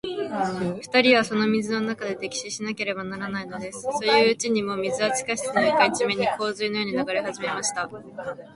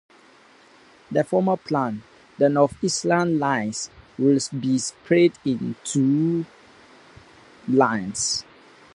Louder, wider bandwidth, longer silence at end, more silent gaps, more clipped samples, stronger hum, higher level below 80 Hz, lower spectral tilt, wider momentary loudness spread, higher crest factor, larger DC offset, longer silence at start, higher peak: about the same, -24 LUFS vs -22 LUFS; about the same, 11.5 kHz vs 11.5 kHz; second, 0.05 s vs 0.5 s; neither; neither; neither; about the same, -64 dBFS vs -60 dBFS; second, -3.5 dB/octave vs -5 dB/octave; first, 12 LU vs 9 LU; about the same, 20 dB vs 20 dB; neither; second, 0.05 s vs 1.1 s; about the same, -4 dBFS vs -4 dBFS